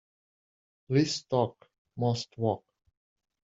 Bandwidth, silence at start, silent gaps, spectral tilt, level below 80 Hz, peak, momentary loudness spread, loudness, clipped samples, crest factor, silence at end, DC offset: 7.8 kHz; 0.9 s; 1.78-1.85 s; -6 dB/octave; -68 dBFS; -12 dBFS; 8 LU; -30 LUFS; under 0.1%; 20 dB; 0.85 s; under 0.1%